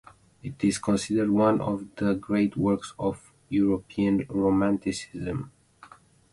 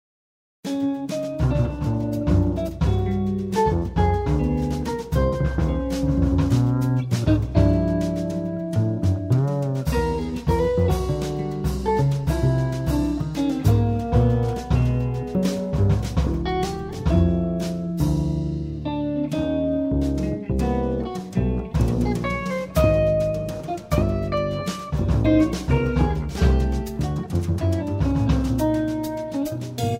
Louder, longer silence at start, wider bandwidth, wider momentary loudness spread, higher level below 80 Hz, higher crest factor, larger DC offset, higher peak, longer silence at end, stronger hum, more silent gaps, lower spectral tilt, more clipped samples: second, -26 LUFS vs -23 LUFS; second, 0.45 s vs 0.65 s; second, 11.5 kHz vs 16 kHz; first, 10 LU vs 7 LU; second, -54 dBFS vs -30 dBFS; about the same, 18 dB vs 16 dB; neither; second, -8 dBFS vs -4 dBFS; first, 0.85 s vs 0 s; neither; neither; second, -6.5 dB/octave vs -8 dB/octave; neither